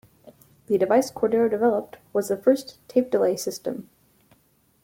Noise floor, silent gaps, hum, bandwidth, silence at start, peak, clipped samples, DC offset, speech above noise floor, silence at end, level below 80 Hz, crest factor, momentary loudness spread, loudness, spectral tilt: -63 dBFS; none; none; 17 kHz; 0.25 s; -6 dBFS; under 0.1%; under 0.1%; 40 dB; 1 s; -66 dBFS; 18 dB; 9 LU; -24 LUFS; -5 dB/octave